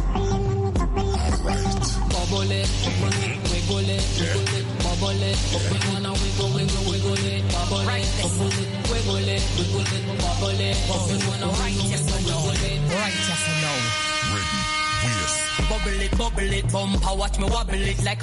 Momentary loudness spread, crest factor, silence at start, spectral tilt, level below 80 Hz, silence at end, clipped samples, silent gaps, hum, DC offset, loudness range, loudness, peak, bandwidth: 2 LU; 12 dB; 0 s; -4 dB/octave; -28 dBFS; 0 s; under 0.1%; none; none; under 0.1%; 1 LU; -23 LUFS; -10 dBFS; 11.5 kHz